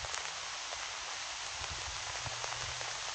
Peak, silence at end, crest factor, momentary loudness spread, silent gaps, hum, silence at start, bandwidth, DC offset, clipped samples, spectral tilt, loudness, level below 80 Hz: -16 dBFS; 0 s; 24 dB; 2 LU; none; none; 0 s; 9.4 kHz; under 0.1%; under 0.1%; 0 dB/octave; -38 LUFS; -58 dBFS